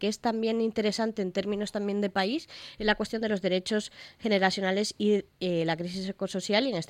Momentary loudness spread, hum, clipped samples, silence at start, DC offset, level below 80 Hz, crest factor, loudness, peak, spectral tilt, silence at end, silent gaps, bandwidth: 7 LU; none; under 0.1%; 0 s; under 0.1%; -58 dBFS; 20 dB; -29 LUFS; -10 dBFS; -5 dB/octave; 0.05 s; none; 14.5 kHz